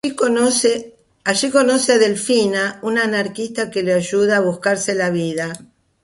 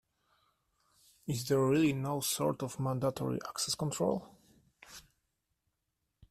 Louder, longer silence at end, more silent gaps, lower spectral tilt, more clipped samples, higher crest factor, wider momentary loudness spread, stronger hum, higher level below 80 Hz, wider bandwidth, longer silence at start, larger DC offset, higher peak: first, -17 LUFS vs -33 LUFS; second, 0.45 s vs 1.3 s; neither; second, -3.5 dB/octave vs -5 dB/octave; neither; about the same, 16 dB vs 18 dB; second, 9 LU vs 20 LU; neither; first, -60 dBFS vs -68 dBFS; second, 11.5 kHz vs 15 kHz; second, 0.05 s vs 1.25 s; neither; first, -2 dBFS vs -18 dBFS